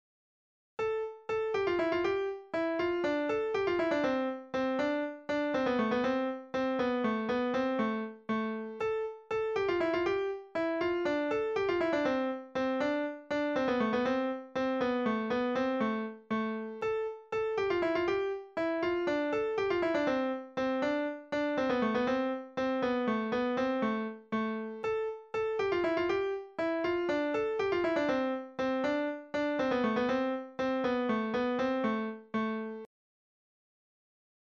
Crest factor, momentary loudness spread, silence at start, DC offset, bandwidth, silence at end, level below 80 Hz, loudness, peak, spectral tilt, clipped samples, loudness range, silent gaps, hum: 14 dB; 6 LU; 0.8 s; under 0.1%; 7.8 kHz; 1.55 s; -64 dBFS; -32 LUFS; -18 dBFS; -6 dB/octave; under 0.1%; 2 LU; none; none